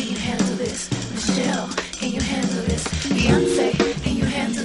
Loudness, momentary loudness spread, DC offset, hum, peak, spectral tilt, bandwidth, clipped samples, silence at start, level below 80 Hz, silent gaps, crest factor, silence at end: -22 LUFS; 8 LU; under 0.1%; none; -2 dBFS; -4.5 dB/octave; 11.5 kHz; under 0.1%; 0 s; -36 dBFS; none; 20 dB; 0 s